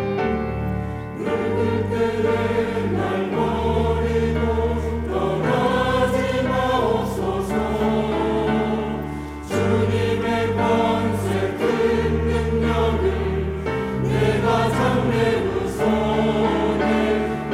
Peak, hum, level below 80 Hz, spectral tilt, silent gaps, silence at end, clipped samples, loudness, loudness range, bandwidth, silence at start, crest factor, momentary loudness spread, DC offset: -6 dBFS; none; -36 dBFS; -7 dB/octave; none; 0 s; under 0.1%; -21 LUFS; 2 LU; 15.5 kHz; 0 s; 14 dB; 5 LU; under 0.1%